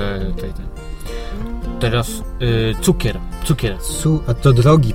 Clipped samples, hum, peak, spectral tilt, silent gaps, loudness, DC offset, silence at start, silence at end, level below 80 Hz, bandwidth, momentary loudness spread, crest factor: under 0.1%; none; 0 dBFS; -6 dB/octave; none; -18 LUFS; under 0.1%; 0 s; 0 s; -26 dBFS; 16.5 kHz; 16 LU; 16 dB